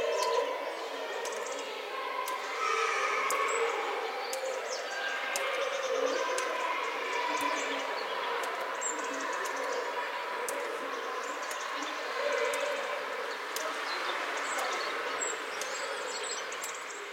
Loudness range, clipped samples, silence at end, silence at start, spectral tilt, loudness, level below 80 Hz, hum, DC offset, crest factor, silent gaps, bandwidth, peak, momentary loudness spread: 2 LU; under 0.1%; 0 s; 0 s; 0.5 dB/octave; -33 LUFS; -90 dBFS; none; under 0.1%; 22 dB; none; 16 kHz; -12 dBFS; 6 LU